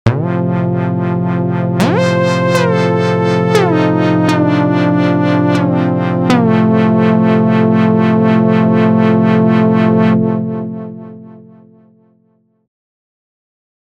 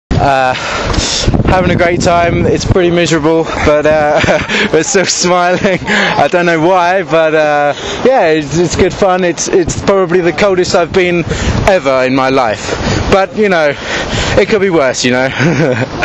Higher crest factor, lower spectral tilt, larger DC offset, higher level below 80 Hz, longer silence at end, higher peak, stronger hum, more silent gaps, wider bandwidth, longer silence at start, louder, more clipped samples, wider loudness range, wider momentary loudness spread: about the same, 12 dB vs 10 dB; first, -8 dB/octave vs -4.5 dB/octave; neither; second, -50 dBFS vs -26 dBFS; first, 2.65 s vs 0 s; about the same, 0 dBFS vs 0 dBFS; neither; neither; about the same, 11 kHz vs 10.5 kHz; about the same, 0.05 s vs 0.1 s; about the same, -12 LUFS vs -10 LUFS; neither; first, 6 LU vs 1 LU; about the same, 5 LU vs 4 LU